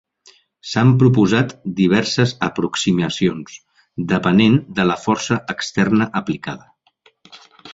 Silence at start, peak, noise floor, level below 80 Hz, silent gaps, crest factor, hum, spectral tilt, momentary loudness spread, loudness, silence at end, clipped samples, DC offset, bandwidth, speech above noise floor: 0.65 s; -2 dBFS; -57 dBFS; -52 dBFS; none; 16 dB; none; -6 dB/octave; 15 LU; -17 LUFS; 0.05 s; under 0.1%; under 0.1%; 7.8 kHz; 40 dB